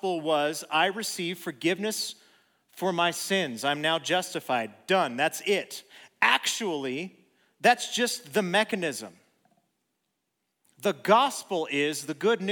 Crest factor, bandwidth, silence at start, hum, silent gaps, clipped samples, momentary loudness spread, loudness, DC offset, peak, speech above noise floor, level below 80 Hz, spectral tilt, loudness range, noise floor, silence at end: 24 dB; over 20 kHz; 0.05 s; none; none; under 0.1%; 10 LU; -27 LUFS; under 0.1%; -4 dBFS; 53 dB; -84 dBFS; -3 dB/octave; 3 LU; -80 dBFS; 0 s